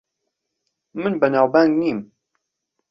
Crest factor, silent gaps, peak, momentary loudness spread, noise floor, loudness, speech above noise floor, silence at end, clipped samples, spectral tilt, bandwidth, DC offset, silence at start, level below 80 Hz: 20 dB; none; -2 dBFS; 14 LU; -78 dBFS; -18 LUFS; 60 dB; 0.85 s; under 0.1%; -8 dB/octave; 6 kHz; under 0.1%; 0.95 s; -64 dBFS